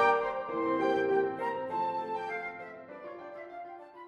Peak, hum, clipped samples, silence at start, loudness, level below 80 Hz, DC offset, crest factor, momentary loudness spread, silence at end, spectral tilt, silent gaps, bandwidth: -14 dBFS; none; under 0.1%; 0 s; -32 LUFS; -72 dBFS; under 0.1%; 18 dB; 17 LU; 0 s; -6 dB/octave; none; 9.2 kHz